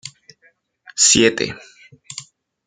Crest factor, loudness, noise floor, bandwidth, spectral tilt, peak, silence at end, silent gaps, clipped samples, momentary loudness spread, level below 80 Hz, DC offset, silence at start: 20 dB; -14 LUFS; -59 dBFS; 11 kHz; -1.5 dB/octave; 0 dBFS; 0.45 s; none; under 0.1%; 24 LU; -54 dBFS; under 0.1%; 0.05 s